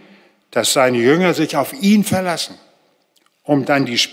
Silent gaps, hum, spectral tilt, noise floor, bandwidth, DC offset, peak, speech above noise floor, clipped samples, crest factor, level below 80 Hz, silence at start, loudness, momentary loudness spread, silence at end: none; none; -4 dB/octave; -60 dBFS; 16.5 kHz; under 0.1%; -2 dBFS; 45 dB; under 0.1%; 16 dB; -64 dBFS; 0.55 s; -16 LUFS; 10 LU; 0 s